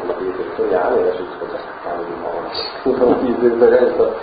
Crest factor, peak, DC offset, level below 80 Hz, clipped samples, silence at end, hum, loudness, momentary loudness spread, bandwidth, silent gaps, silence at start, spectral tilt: 16 dB; -2 dBFS; under 0.1%; -48 dBFS; under 0.1%; 0 s; none; -18 LUFS; 14 LU; 5 kHz; none; 0 s; -10.5 dB/octave